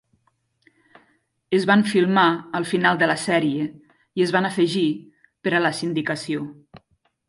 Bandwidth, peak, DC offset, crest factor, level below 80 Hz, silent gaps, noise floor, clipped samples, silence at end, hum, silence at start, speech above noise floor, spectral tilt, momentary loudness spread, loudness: 11.5 kHz; -4 dBFS; under 0.1%; 18 dB; -66 dBFS; none; -68 dBFS; under 0.1%; 0.5 s; none; 1.5 s; 47 dB; -5.5 dB/octave; 12 LU; -21 LUFS